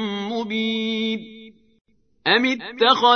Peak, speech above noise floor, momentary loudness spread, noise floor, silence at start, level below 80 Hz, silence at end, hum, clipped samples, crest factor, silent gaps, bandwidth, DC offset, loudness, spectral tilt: -2 dBFS; 27 dB; 9 LU; -45 dBFS; 0 s; -70 dBFS; 0 s; none; under 0.1%; 20 dB; 1.81-1.85 s; 6.6 kHz; under 0.1%; -21 LUFS; -4 dB/octave